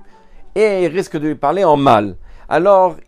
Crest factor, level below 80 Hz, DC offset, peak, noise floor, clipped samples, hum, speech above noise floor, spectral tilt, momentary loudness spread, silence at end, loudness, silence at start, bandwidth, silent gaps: 14 dB; -42 dBFS; under 0.1%; 0 dBFS; -37 dBFS; under 0.1%; none; 23 dB; -6.5 dB/octave; 9 LU; 0.05 s; -14 LUFS; 0 s; 12 kHz; none